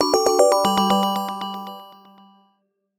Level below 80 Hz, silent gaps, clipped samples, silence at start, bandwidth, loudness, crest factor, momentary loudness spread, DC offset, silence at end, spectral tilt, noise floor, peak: -60 dBFS; none; under 0.1%; 0 s; 18 kHz; -19 LUFS; 20 dB; 18 LU; under 0.1%; 1.1 s; -4 dB/octave; -69 dBFS; -2 dBFS